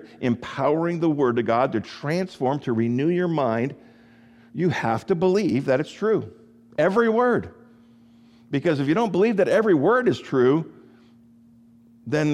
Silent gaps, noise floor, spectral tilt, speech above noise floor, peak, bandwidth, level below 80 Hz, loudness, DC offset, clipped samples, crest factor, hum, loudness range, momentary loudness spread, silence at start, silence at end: none; -53 dBFS; -7.5 dB/octave; 31 dB; -8 dBFS; 11.5 kHz; -64 dBFS; -22 LUFS; under 0.1%; under 0.1%; 16 dB; none; 3 LU; 8 LU; 0 s; 0 s